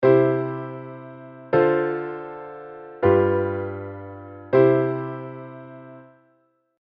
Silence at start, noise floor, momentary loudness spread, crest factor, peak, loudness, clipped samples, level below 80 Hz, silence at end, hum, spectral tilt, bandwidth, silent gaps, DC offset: 0 s; -65 dBFS; 22 LU; 18 dB; -4 dBFS; -21 LUFS; under 0.1%; -62 dBFS; 0.8 s; none; -11 dB/octave; 5.2 kHz; none; under 0.1%